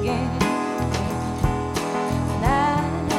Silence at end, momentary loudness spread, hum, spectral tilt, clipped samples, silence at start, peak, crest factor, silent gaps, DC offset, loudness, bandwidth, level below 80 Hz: 0 s; 5 LU; none; -6 dB/octave; under 0.1%; 0 s; -6 dBFS; 16 dB; none; under 0.1%; -23 LUFS; 17 kHz; -34 dBFS